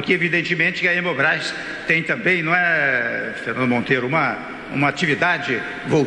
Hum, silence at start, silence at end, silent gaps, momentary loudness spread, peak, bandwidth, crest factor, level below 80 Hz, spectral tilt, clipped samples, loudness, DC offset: none; 0 s; 0 s; none; 8 LU; -4 dBFS; 11 kHz; 16 dB; -56 dBFS; -5.5 dB/octave; under 0.1%; -19 LUFS; under 0.1%